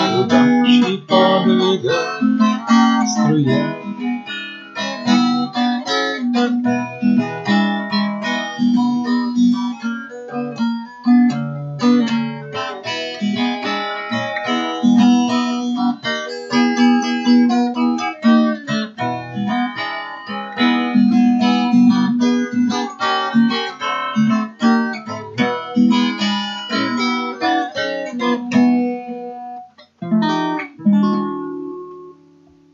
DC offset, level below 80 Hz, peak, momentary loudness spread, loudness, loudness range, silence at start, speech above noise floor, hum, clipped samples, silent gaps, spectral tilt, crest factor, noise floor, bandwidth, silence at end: under 0.1%; -72 dBFS; 0 dBFS; 11 LU; -17 LUFS; 4 LU; 0 s; 32 dB; none; under 0.1%; none; -5.5 dB/octave; 16 dB; -49 dBFS; 7.4 kHz; 0.6 s